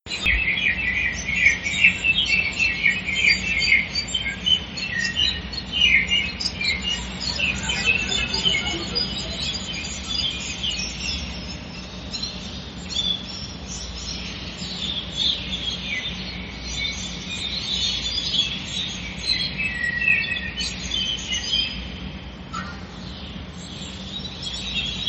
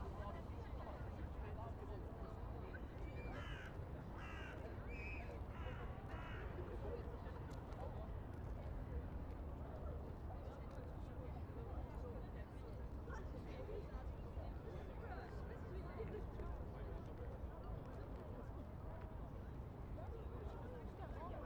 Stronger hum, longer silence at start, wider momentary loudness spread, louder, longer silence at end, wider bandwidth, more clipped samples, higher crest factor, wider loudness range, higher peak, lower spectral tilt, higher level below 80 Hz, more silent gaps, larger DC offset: neither; about the same, 0.05 s vs 0 s; first, 15 LU vs 3 LU; first, -22 LUFS vs -52 LUFS; about the same, 0 s vs 0 s; second, 8.8 kHz vs over 20 kHz; neither; first, 24 dB vs 14 dB; first, 9 LU vs 2 LU; first, 0 dBFS vs -36 dBFS; second, -2 dB/octave vs -8 dB/octave; first, -38 dBFS vs -52 dBFS; neither; neither